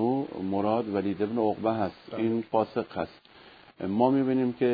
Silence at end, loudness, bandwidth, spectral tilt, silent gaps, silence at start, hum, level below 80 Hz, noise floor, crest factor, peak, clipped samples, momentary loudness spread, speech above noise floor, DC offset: 0 s; -28 LUFS; 5 kHz; -10 dB/octave; none; 0 s; none; -66 dBFS; -53 dBFS; 18 dB; -10 dBFS; under 0.1%; 9 LU; 25 dB; under 0.1%